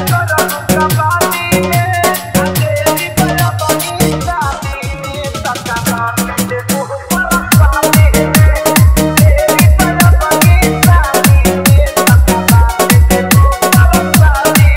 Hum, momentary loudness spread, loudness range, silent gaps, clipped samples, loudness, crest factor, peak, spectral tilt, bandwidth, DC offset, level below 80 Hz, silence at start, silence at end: none; 8 LU; 7 LU; none; 0.3%; -10 LUFS; 10 dB; 0 dBFS; -5 dB/octave; 16.5 kHz; 0.5%; -16 dBFS; 0 s; 0 s